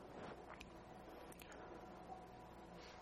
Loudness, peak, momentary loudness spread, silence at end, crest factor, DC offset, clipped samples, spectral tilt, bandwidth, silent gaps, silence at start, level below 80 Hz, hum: -57 LUFS; -36 dBFS; 4 LU; 0 s; 20 dB; under 0.1%; under 0.1%; -5 dB/octave; 16 kHz; none; 0 s; -70 dBFS; none